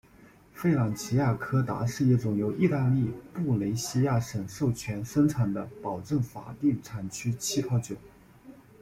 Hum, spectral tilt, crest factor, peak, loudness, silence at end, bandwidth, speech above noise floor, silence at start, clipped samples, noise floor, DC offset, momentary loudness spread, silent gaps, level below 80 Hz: none; -6.5 dB/octave; 16 dB; -12 dBFS; -29 LUFS; 0.3 s; 15.5 kHz; 28 dB; 0.2 s; under 0.1%; -55 dBFS; under 0.1%; 9 LU; none; -56 dBFS